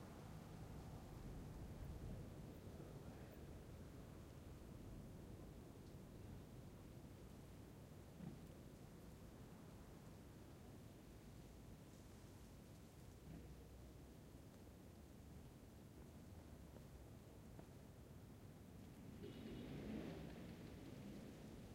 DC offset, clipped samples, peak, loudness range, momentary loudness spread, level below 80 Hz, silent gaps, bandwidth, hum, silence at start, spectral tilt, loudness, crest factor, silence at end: under 0.1%; under 0.1%; -40 dBFS; 5 LU; 7 LU; -64 dBFS; none; 16 kHz; none; 0 s; -6.5 dB/octave; -59 LUFS; 16 dB; 0 s